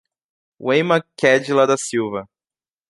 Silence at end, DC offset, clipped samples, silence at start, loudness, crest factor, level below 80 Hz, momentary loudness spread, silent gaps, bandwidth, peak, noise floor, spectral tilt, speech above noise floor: 0.65 s; under 0.1%; under 0.1%; 0.6 s; -18 LUFS; 20 dB; -66 dBFS; 11 LU; none; 11.5 kHz; 0 dBFS; under -90 dBFS; -4.5 dB/octave; over 72 dB